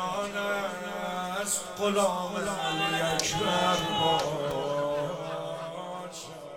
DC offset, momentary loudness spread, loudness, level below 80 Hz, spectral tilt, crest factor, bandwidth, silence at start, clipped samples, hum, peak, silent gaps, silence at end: under 0.1%; 11 LU; -29 LUFS; -58 dBFS; -3 dB/octave; 22 dB; 16.5 kHz; 0 s; under 0.1%; none; -8 dBFS; none; 0 s